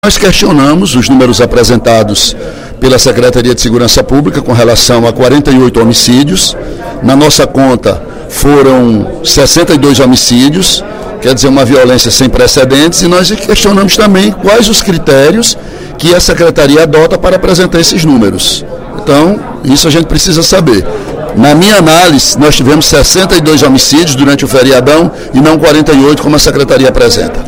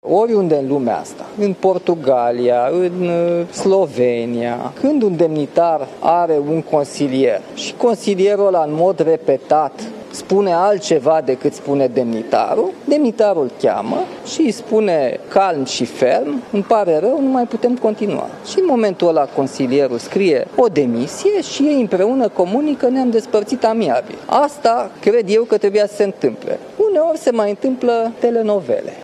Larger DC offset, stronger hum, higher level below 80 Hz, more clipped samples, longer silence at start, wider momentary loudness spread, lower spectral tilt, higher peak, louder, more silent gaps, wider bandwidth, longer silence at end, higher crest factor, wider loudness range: neither; neither; first, -22 dBFS vs -64 dBFS; first, 7% vs under 0.1%; about the same, 0.05 s vs 0.05 s; about the same, 6 LU vs 6 LU; second, -4 dB/octave vs -6 dB/octave; about the same, 0 dBFS vs -2 dBFS; first, -5 LUFS vs -16 LUFS; neither; first, over 20 kHz vs 12.5 kHz; about the same, 0 s vs 0 s; second, 6 dB vs 14 dB; about the same, 2 LU vs 1 LU